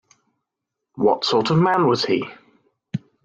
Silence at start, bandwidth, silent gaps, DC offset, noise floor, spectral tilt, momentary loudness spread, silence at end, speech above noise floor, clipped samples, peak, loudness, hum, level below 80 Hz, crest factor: 0.95 s; 7.8 kHz; none; under 0.1%; -82 dBFS; -6 dB/octave; 15 LU; 0.3 s; 64 dB; under 0.1%; -6 dBFS; -19 LUFS; none; -62 dBFS; 16 dB